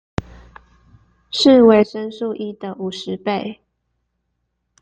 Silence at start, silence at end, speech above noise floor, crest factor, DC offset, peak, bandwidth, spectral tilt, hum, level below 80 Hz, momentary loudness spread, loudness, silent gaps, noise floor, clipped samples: 0.2 s; 1.3 s; 56 dB; 18 dB; under 0.1%; -2 dBFS; 9 kHz; -5.5 dB/octave; none; -50 dBFS; 18 LU; -17 LUFS; none; -72 dBFS; under 0.1%